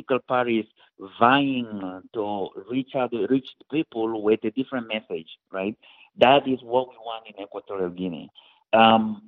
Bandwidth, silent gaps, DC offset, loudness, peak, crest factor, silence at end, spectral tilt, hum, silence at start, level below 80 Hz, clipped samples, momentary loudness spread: 4.7 kHz; none; under 0.1%; -24 LUFS; 0 dBFS; 24 dB; 0.1 s; -3 dB/octave; none; 0.1 s; -66 dBFS; under 0.1%; 18 LU